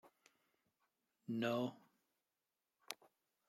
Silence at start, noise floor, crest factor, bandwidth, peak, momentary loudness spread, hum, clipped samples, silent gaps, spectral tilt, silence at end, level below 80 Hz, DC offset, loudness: 0.05 s; under -90 dBFS; 28 dB; 15.5 kHz; -20 dBFS; 13 LU; none; under 0.1%; none; -5.5 dB/octave; 0.55 s; under -90 dBFS; under 0.1%; -44 LUFS